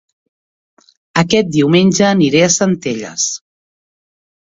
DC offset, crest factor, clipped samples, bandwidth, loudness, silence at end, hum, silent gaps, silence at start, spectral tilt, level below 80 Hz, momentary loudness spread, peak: under 0.1%; 16 dB; under 0.1%; 7.8 kHz; -13 LUFS; 1.05 s; none; none; 1.15 s; -4.5 dB/octave; -52 dBFS; 9 LU; 0 dBFS